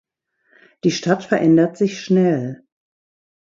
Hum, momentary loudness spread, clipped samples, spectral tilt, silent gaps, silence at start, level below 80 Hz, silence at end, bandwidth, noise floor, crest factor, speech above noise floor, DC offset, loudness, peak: none; 9 LU; under 0.1%; -6.5 dB/octave; none; 0.85 s; -64 dBFS; 0.85 s; 7.6 kHz; -64 dBFS; 18 dB; 47 dB; under 0.1%; -18 LUFS; -2 dBFS